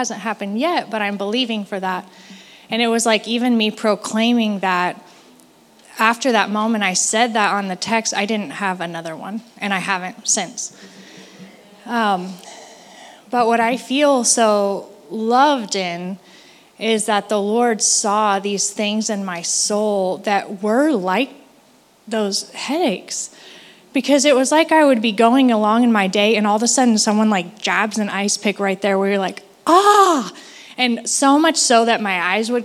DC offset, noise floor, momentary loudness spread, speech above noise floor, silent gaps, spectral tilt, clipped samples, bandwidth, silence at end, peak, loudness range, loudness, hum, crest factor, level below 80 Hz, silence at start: under 0.1%; -52 dBFS; 12 LU; 35 dB; none; -3 dB/octave; under 0.1%; 15 kHz; 0 s; 0 dBFS; 7 LU; -17 LUFS; none; 18 dB; -76 dBFS; 0 s